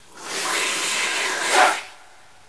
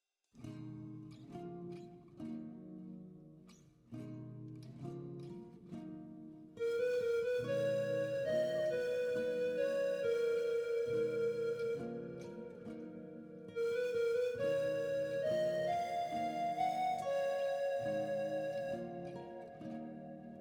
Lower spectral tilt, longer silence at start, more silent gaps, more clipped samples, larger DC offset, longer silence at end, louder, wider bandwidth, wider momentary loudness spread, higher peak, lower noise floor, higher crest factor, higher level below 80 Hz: second, 1 dB/octave vs -6 dB/octave; second, 0.15 s vs 0.35 s; neither; neither; first, 0.4% vs under 0.1%; first, 0.55 s vs 0 s; first, -20 LUFS vs -38 LUFS; second, 11 kHz vs 18 kHz; second, 12 LU vs 16 LU; first, -2 dBFS vs -26 dBFS; second, -50 dBFS vs -62 dBFS; first, 22 dB vs 14 dB; about the same, -72 dBFS vs -76 dBFS